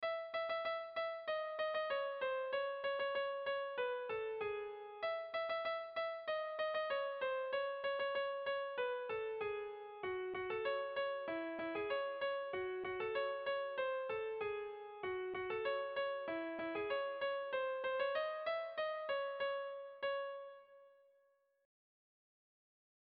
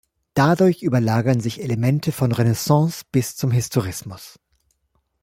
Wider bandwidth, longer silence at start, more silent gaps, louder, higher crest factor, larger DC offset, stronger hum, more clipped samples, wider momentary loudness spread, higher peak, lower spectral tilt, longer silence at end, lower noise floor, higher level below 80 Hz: second, 5.4 kHz vs 16.5 kHz; second, 0 s vs 0.35 s; neither; second, -41 LUFS vs -20 LUFS; about the same, 14 dB vs 18 dB; neither; neither; neither; second, 4 LU vs 9 LU; second, -28 dBFS vs -2 dBFS; second, -0.5 dB/octave vs -6.5 dB/octave; first, 2.1 s vs 0.95 s; first, -76 dBFS vs -69 dBFS; second, -80 dBFS vs -52 dBFS